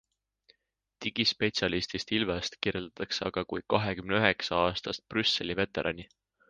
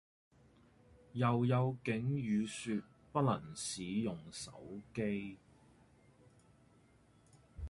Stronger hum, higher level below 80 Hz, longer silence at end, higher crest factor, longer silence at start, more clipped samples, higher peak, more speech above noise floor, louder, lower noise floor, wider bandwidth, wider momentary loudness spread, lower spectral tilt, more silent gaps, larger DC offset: neither; first, -56 dBFS vs -62 dBFS; first, 0.45 s vs 0 s; first, 26 dB vs 20 dB; second, 1 s vs 1.15 s; neither; first, -6 dBFS vs -20 dBFS; first, 48 dB vs 30 dB; first, -30 LUFS vs -38 LUFS; first, -79 dBFS vs -67 dBFS; second, 9.8 kHz vs 11.5 kHz; second, 8 LU vs 14 LU; second, -4.5 dB/octave vs -6 dB/octave; neither; neither